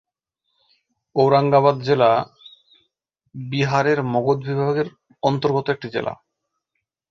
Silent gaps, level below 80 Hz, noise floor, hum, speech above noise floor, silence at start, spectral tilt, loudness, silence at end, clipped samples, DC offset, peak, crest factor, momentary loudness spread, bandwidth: none; -60 dBFS; -78 dBFS; none; 60 dB; 1.15 s; -7 dB/octave; -20 LUFS; 0.95 s; under 0.1%; under 0.1%; -2 dBFS; 20 dB; 14 LU; 7.4 kHz